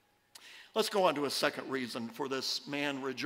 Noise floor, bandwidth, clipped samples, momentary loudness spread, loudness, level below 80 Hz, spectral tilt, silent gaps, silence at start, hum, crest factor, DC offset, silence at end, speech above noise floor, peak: -58 dBFS; 16 kHz; under 0.1%; 10 LU; -34 LUFS; -84 dBFS; -3 dB/octave; none; 0.4 s; none; 22 dB; under 0.1%; 0 s; 24 dB; -12 dBFS